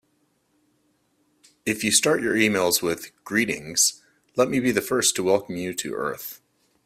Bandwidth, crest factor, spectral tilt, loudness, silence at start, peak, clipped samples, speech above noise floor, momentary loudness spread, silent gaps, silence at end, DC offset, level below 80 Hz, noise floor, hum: 16 kHz; 22 dB; -2.5 dB/octave; -22 LUFS; 1.65 s; -4 dBFS; under 0.1%; 45 dB; 11 LU; none; 0.5 s; under 0.1%; -62 dBFS; -68 dBFS; none